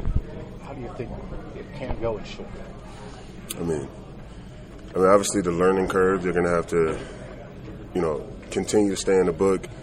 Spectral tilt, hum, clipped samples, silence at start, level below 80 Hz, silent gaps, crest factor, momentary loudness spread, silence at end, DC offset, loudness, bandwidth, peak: -5.5 dB/octave; none; under 0.1%; 0 s; -38 dBFS; none; 22 dB; 20 LU; 0 s; under 0.1%; -24 LUFS; 15.5 kHz; -4 dBFS